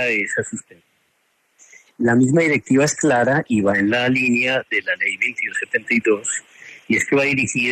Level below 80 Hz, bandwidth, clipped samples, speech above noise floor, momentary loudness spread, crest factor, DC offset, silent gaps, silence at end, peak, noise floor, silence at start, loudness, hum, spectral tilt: -60 dBFS; 13.5 kHz; under 0.1%; 47 dB; 7 LU; 14 dB; under 0.1%; none; 0 s; -4 dBFS; -65 dBFS; 0 s; -18 LUFS; none; -4.5 dB/octave